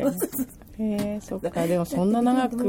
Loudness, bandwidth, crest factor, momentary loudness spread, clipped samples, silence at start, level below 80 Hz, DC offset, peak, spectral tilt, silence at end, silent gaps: -26 LUFS; 17 kHz; 14 dB; 9 LU; under 0.1%; 0 s; -52 dBFS; under 0.1%; -12 dBFS; -6.5 dB/octave; 0 s; none